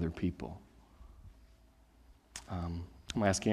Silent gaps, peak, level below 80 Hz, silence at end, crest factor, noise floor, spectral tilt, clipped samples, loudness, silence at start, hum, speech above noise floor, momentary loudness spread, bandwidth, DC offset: none; -14 dBFS; -56 dBFS; 0 s; 24 dB; -63 dBFS; -5 dB/octave; under 0.1%; -38 LUFS; 0 s; none; 29 dB; 27 LU; 14 kHz; under 0.1%